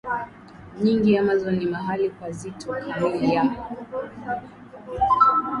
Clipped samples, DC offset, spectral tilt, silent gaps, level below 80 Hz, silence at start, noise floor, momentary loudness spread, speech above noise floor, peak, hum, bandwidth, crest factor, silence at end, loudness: under 0.1%; under 0.1%; -7 dB/octave; none; -50 dBFS; 0.05 s; -44 dBFS; 16 LU; 20 dB; -6 dBFS; none; 11.5 kHz; 18 dB; 0 s; -23 LUFS